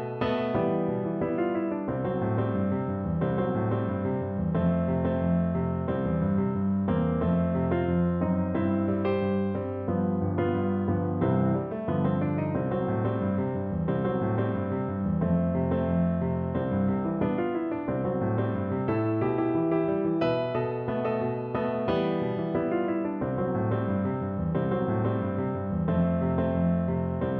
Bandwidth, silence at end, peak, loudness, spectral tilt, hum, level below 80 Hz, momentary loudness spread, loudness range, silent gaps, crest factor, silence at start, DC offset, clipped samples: 4.6 kHz; 0 s; -12 dBFS; -28 LUFS; -11.5 dB/octave; none; -48 dBFS; 4 LU; 2 LU; none; 14 dB; 0 s; under 0.1%; under 0.1%